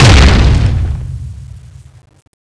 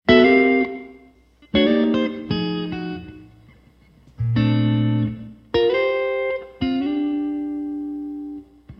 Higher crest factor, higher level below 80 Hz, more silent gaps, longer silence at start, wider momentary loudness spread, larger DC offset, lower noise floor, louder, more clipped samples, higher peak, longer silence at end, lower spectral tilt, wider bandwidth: second, 10 dB vs 20 dB; first, -14 dBFS vs -46 dBFS; neither; about the same, 0 s vs 0.05 s; first, 24 LU vs 15 LU; neither; second, -34 dBFS vs -52 dBFS; first, -10 LUFS vs -21 LUFS; first, 0.4% vs under 0.1%; about the same, 0 dBFS vs -2 dBFS; first, 1 s vs 0.05 s; second, -5 dB/octave vs -8.5 dB/octave; first, 11 kHz vs 6.4 kHz